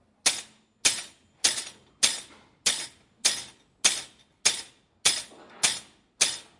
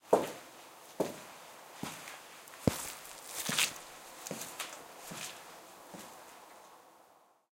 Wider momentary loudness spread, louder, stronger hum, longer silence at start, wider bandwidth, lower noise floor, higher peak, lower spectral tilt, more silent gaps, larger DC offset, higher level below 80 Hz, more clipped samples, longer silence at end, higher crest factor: second, 13 LU vs 21 LU; first, -26 LUFS vs -38 LUFS; neither; first, 0.25 s vs 0.05 s; second, 11.5 kHz vs 17 kHz; second, -47 dBFS vs -64 dBFS; first, -2 dBFS vs -12 dBFS; second, 2 dB/octave vs -3 dB/octave; neither; neither; about the same, -68 dBFS vs -66 dBFS; neither; second, 0.2 s vs 0.35 s; about the same, 28 dB vs 28 dB